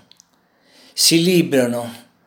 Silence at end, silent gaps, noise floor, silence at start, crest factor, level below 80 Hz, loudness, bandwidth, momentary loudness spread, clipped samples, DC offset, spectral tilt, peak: 0.3 s; none; -59 dBFS; 0.95 s; 18 dB; -74 dBFS; -16 LUFS; 19 kHz; 16 LU; under 0.1%; under 0.1%; -3.5 dB/octave; 0 dBFS